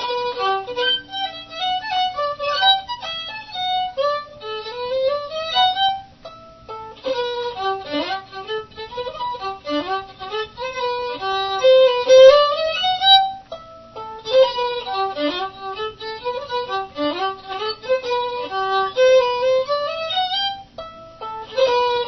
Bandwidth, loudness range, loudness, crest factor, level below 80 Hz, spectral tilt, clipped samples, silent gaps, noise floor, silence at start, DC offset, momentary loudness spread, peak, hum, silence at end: 6.2 kHz; 11 LU; -19 LUFS; 20 dB; -56 dBFS; -2.5 dB/octave; under 0.1%; none; -41 dBFS; 0 s; under 0.1%; 16 LU; 0 dBFS; none; 0 s